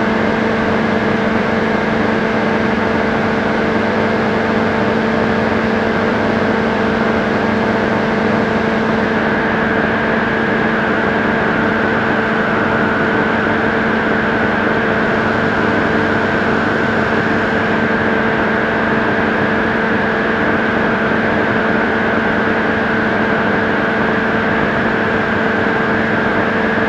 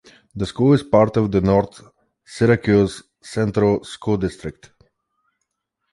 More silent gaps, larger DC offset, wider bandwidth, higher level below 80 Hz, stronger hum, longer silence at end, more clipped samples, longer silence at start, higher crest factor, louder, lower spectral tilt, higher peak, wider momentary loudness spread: neither; neither; second, 8.4 kHz vs 11.5 kHz; first, -38 dBFS vs -44 dBFS; neither; second, 0 s vs 1.4 s; neither; second, 0 s vs 0.35 s; about the same, 14 dB vs 18 dB; first, -15 LUFS vs -19 LUFS; about the same, -6.5 dB/octave vs -7.5 dB/octave; about the same, 0 dBFS vs -2 dBFS; second, 1 LU vs 18 LU